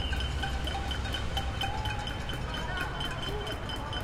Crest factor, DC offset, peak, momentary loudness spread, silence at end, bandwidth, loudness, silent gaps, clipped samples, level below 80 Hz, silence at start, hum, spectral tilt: 14 dB; under 0.1%; -18 dBFS; 3 LU; 0 s; 16 kHz; -34 LUFS; none; under 0.1%; -38 dBFS; 0 s; none; -4.5 dB/octave